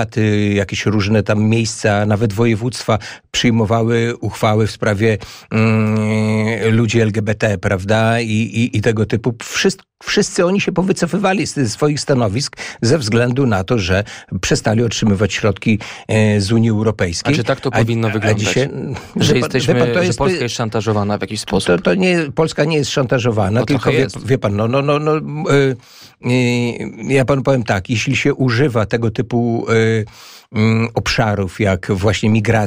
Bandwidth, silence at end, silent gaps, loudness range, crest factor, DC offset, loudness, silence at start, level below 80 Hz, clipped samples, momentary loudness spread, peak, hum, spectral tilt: 15.5 kHz; 0 s; none; 1 LU; 14 dB; under 0.1%; -16 LUFS; 0 s; -42 dBFS; under 0.1%; 5 LU; -2 dBFS; none; -5.5 dB/octave